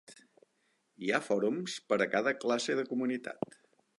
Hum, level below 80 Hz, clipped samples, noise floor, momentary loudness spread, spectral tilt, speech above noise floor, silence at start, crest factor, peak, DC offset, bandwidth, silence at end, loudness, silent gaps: none; -84 dBFS; under 0.1%; -76 dBFS; 10 LU; -4 dB/octave; 44 dB; 0.1 s; 20 dB; -14 dBFS; under 0.1%; 11.5 kHz; 0.65 s; -33 LUFS; none